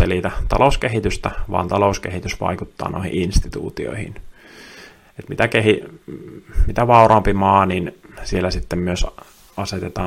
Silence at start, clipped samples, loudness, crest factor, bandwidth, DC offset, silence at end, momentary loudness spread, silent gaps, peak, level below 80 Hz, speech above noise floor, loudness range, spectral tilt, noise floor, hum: 0 s; under 0.1%; -19 LUFS; 18 dB; 15.5 kHz; under 0.1%; 0 s; 20 LU; none; 0 dBFS; -28 dBFS; 25 dB; 7 LU; -6 dB/octave; -43 dBFS; none